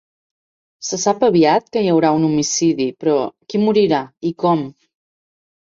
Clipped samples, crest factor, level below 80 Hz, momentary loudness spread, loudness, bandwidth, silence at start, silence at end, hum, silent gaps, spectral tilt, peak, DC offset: under 0.1%; 16 dB; -60 dBFS; 8 LU; -17 LUFS; 7.6 kHz; 0.8 s; 0.95 s; none; none; -5 dB/octave; -2 dBFS; under 0.1%